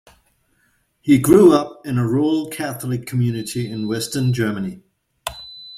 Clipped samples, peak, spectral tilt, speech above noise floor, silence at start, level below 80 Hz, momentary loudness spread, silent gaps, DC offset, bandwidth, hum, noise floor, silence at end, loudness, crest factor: under 0.1%; -2 dBFS; -6.5 dB/octave; 46 dB; 1.05 s; -52 dBFS; 19 LU; none; under 0.1%; 16 kHz; none; -63 dBFS; 0 s; -18 LUFS; 18 dB